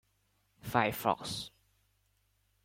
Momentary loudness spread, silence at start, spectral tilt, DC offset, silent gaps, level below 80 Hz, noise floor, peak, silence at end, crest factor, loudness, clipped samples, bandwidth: 16 LU; 0.65 s; -4.5 dB/octave; under 0.1%; none; -66 dBFS; -75 dBFS; -12 dBFS; 1.15 s; 26 dB; -33 LUFS; under 0.1%; 16.5 kHz